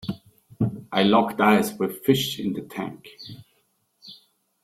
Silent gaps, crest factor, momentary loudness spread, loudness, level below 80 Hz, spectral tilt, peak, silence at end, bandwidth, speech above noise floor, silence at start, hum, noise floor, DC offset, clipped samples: none; 20 dB; 22 LU; -23 LUFS; -60 dBFS; -5.5 dB/octave; -4 dBFS; 0.5 s; 16.5 kHz; 46 dB; 0.05 s; none; -69 dBFS; under 0.1%; under 0.1%